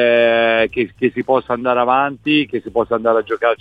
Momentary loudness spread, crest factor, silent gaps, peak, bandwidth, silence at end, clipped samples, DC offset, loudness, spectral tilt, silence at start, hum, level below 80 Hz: 6 LU; 14 dB; none; -2 dBFS; 5 kHz; 0.05 s; under 0.1%; under 0.1%; -16 LUFS; -7 dB/octave; 0 s; none; -52 dBFS